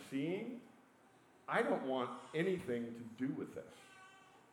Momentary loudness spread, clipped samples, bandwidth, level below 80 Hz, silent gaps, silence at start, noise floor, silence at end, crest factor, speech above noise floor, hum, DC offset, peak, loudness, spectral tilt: 21 LU; under 0.1%; 17 kHz; -82 dBFS; none; 0 s; -67 dBFS; 0.1 s; 20 dB; 27 dB; none; under 0.1%; -22 dBFS; -40 LUFS; -6.5 dB/octave